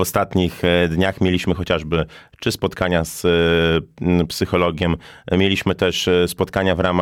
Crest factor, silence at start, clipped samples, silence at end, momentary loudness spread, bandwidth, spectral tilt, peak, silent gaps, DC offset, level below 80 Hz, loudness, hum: 14 dB; 0 s; under 0.1%; 0 s; 6 LU; 17 kHz; -5.5 dB/octave; -6 dBFS; none; under 0.1%; -38 dBFS; -19 LUFS; none